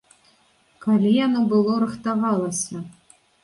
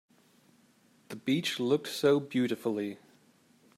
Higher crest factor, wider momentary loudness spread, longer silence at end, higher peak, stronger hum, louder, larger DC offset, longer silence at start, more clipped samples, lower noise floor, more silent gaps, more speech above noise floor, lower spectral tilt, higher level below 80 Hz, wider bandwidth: about the same, 14 dB vs 18 dB; about the same, 12 LU vs 12 LU; second, 0.5 s vs 0.8 s; first, -8 dBFS vs -14 dBFS; neither; first, -21 LUFS vs -30 LUFS; neither; second, 0.8 s vs 1.1 s; neither; second, -60 dBFS vs -65 dBFS; neither; first, 40 dB vs 35 dB; about the same, -5.5 dB/octave vs -5 dB/octave; first, -66 dBFS vs -78 dBFS; second, 11.5 kHz vs 15 kHz